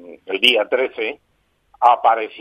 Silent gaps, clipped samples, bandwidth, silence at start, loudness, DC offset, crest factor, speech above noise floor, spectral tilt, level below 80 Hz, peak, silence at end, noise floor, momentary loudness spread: none; under 0.1%; 15.5 kHz; 0.05 s; -17 LUFS; under 0.1%; 18 dB; 41 dB; -1.5 dB/octave; -68 dBFS; 0 dBFS; 0 s; -57 dBFS; 12 LU